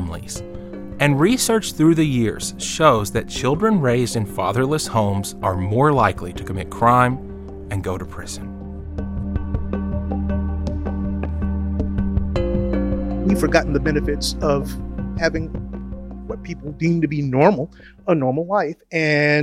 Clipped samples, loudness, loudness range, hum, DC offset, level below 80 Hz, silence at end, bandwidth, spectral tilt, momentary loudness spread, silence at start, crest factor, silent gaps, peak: under 0.1%; -20 LUFS; 7 LU; none; under 0.1%; -30 dBFS; 0 s; 16.5 kHz; -5.5 dB/octave; 15 LU; 0 s; 18 dB; none; -2 dBFS